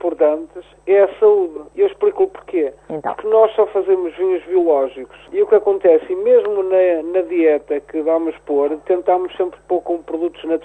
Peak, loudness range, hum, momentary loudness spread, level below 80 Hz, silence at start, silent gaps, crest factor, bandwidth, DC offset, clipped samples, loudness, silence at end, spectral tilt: -2 dBFS; 3 LU; none; 10 LU; -56 dBFS; 0 s; none; 16 dB; 8.6 kHz; under 0.1%; under 0.1%; -17 LUFS; 0.05 s; -7 dB/octave